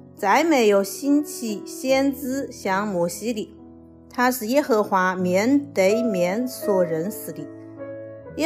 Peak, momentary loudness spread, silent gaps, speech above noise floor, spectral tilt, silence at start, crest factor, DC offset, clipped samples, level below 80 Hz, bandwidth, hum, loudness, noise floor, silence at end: -8 dBFS; 17 LU; none; 24 dB; -5 dB/octave; 0.15 s; 14 dB; under 0.1%; under 0.1%; -60 dBFS; 16 kHz; none; -22 LUFS; -45 dBFS; 0 s